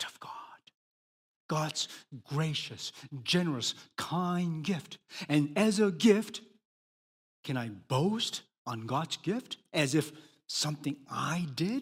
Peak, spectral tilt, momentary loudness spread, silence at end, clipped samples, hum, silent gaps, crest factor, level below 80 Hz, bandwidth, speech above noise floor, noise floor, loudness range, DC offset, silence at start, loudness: -12 dBFS; -5 dB/octave; 14 LU; 0 s; under 0.1%; none; 0.74-1.49 s, 6.65-7.43 s, 8.58-8.65 s; 20 dB; -74 dBFS; 16 kHz; over 58 dB; under -90 dBFS; 5 LU; under 0.1%; 0 s; -32 LUFS